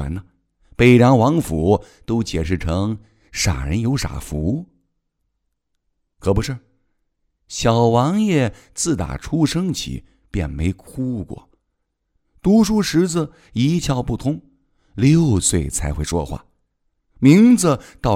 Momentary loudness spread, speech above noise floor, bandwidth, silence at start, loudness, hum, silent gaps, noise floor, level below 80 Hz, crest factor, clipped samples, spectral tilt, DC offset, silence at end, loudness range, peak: 16 LU; 56 dB; 16 kHz; 0 s; -18 LUFS; none; none; -73 dBFS; -34 dBFS; 18 dB; under 0.1%; -6 dB/octave; under 0.1%; 0 s; 8 LU; 0 dBFS